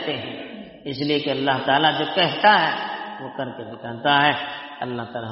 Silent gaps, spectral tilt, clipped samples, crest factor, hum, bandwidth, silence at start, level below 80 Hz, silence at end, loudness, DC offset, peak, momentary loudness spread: none; -1.5 dB/octave; under 0.1%; 20 dB; none; 5.8 kHz; 0 s; -64 dBFS; 0 s; -21 LUFS; under 0.1%; -2 dBFS; 16 LU